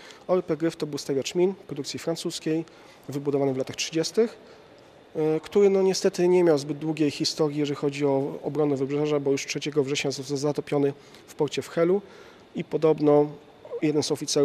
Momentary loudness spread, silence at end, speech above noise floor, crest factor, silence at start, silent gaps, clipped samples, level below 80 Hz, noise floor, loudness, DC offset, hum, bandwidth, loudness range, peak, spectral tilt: 10 LU; 0 s; 26 dB; 18 dB; 0 s; none; under 0.1%; -68 dBFS; -51 dBFS; -25 LUFS; under 0.1%; none; 14.5 kHz; 5 LU; -8 dBFS; -5 dB/octave